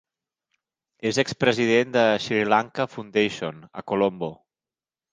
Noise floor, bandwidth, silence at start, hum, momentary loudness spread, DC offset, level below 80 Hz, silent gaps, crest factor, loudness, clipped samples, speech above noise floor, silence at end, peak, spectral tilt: under -90 dBFS; 10 kHz; 1.05 s; none; 13 LU; under 0.1%; -64 dBFS; none; 22 dB; -23 LUFS; under 0.1%; over 67 dB; 0.8 s; -4 dBFS; -5 dB/octave